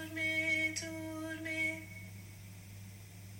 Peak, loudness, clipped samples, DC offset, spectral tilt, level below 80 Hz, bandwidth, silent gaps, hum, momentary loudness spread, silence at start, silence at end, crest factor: -24 dBFS; -35 LUFS; under 0.1%; under 0.1%; -3.5 dB/octave; -66 dBFS; 17 kHz; none; none; 20 LU; 0 s; 0 s; 16 dB